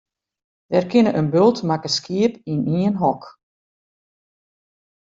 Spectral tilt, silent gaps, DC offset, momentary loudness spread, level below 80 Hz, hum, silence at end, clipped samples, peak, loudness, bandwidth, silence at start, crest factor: -6.5 dB/octave; none; under 0.1%; 6 LU; -62 dBFS; none; 1.85 s; under 0.1%; -4 dBFS; -19 LUFS; 7.8 kHz; 0.7 s; 18 dB